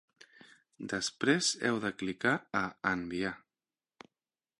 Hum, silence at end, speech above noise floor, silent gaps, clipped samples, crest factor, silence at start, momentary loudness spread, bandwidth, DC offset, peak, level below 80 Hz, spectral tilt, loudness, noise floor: none; 1.2 s; over 57 dB; none; under 0.1%; 22 dB; 0.8 s; 10 LU; 11.5 kHz; under 0.1%; -14 dBFS; -68 dBFS; -3.5 dB/octave; -32 LUFS; under -90 dBFS